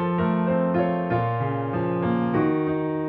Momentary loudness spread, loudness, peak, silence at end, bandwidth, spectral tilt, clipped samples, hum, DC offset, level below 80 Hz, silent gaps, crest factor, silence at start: 3 LU; -24 LUFS; -10 dBFS; 0 s; 4.2 kHz; -11.5 dB/octave; under 0.1%; none; under 0.1%; -54 dBFS; none; 14 dB; 0 s